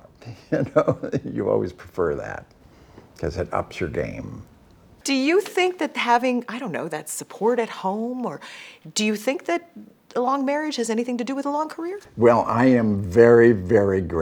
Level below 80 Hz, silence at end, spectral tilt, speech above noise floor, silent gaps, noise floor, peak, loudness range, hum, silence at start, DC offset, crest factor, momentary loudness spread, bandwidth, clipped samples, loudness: -50 dBFS; 0 s; -5.5 dB/octave; 30 dB; none; -51 dBFS; -2 dBFS; 9 LU; none; 0.25 s; under 0.1%; 22 dB; 14 LU; 18.5 kHz; under 0.1%; -22 LUFS